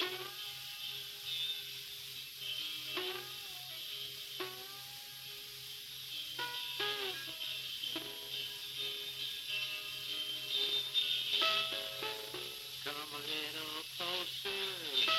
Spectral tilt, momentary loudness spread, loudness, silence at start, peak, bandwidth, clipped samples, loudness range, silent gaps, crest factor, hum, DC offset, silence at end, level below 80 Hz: -0.5 dB/octave; 11 LU; -38 LUFS; 0 s; -18 dBFS; 17 kHz; under 0.1%; 7 LU; none; 22 dB; none; under 0.1%; 0 s; -78 dBFS